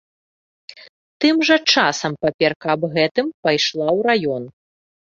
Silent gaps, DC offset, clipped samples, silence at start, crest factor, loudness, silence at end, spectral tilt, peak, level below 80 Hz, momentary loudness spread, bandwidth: 0.89-1.20 s, 2.34-2.39 s, 2.56-2.60 s, 3.11-3.15 s, 3.34-3.43 s; under 0.1%; under 0.1%; 0.7 s; 18 dB; -18 LUFS; 0.65 s; -4 dB/octave; -2 dBFS; -62 dBFS; 8 LU; 7.6 kHz